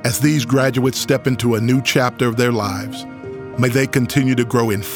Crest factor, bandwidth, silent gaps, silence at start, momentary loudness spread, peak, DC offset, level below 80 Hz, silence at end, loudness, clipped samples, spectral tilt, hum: 16 dB; over 20 kHz; none; 0 s; 11 LU; -2 dBFS; under 0.1%; -50 dBFS; 0 s; -17 LUFS; under 0.1%; -5.5 dB/octave; none